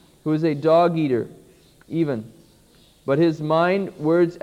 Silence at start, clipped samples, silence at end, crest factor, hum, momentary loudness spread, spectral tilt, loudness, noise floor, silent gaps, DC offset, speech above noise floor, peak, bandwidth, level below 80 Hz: 0.25 s; under 0.1%; 0.05 s; 16 dB; none; 12 LU; -8.5 dB/octave; -21 LUFS; -54 dBFS; none; under 0.1%; 34 dB; -6 dBFS; 10.5 kHz; -62 dBFS